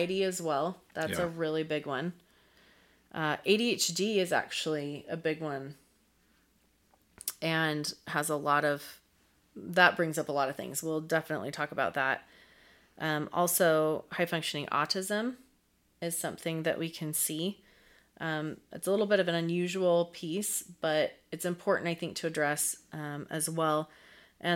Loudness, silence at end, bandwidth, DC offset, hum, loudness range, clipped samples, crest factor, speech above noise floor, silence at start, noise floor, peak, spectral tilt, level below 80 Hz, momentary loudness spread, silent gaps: -31 LUFS; 0 s; 17 kHz; under 0.1%; none; 5 LU; under 0.1%; 26 dB; 39 dB; 0 s; -70 dBFS; -6 dBFS; -3.5 dB/octave; -72 dBFS; 11 LU; none